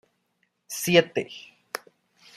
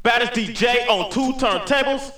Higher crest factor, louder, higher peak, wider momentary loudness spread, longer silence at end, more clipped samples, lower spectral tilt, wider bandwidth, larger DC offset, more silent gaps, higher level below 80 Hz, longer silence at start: first, 24 dB vs 16 dB; second, -23 LUFS vs -19 LUFS; about the same, -4 dBFS vs -4 dBFS; first, 18 LU vs 4 LU; first, 0.6 s vs 0 s; neither; about the same, -4 dB/octave vs -3.5 dB/octave; second, 15.5 kHz vs 20 kHz; second, under 0.1% vs 0.5%; neither; second, -70 dBFS vs -42 dBFS; first, 0.7 s vs 0.05 s